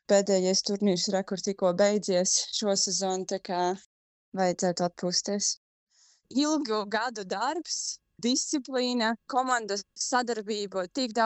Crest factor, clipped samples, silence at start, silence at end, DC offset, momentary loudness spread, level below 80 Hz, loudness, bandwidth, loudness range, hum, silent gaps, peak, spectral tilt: 18 dB; under 0.1%; 0.1 s; 0 s; under 0.1%; 8 LU; -74 dBFS; -28 LUFS; 8.6 kHz; 4 LU; none; 3.86-4.32 s, 5.57-5.87 s; -10 dBFS; -3 dB/octave